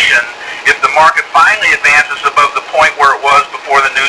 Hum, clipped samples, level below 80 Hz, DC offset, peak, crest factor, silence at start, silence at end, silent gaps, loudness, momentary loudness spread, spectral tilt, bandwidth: none; 0.8%; -46 dBFS; under 0.1%; 0 dBFS; 10 dB; 0 s; 0 s; none; -8 LUFS; 5 LU; -0.5 dB/octave; 11 kHz